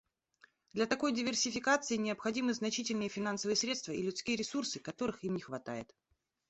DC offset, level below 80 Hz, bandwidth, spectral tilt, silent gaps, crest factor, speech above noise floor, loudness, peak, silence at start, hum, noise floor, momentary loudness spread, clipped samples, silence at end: under 0.1%; -72 dBFS; 8.2 kHz; -3 dB/octave; none; 20 dB; 33 dB; -35 LUFS; -16 dBFS; 0.75 s; none; -68 dBFS; 10 LU; under 0.1%; 0.65 s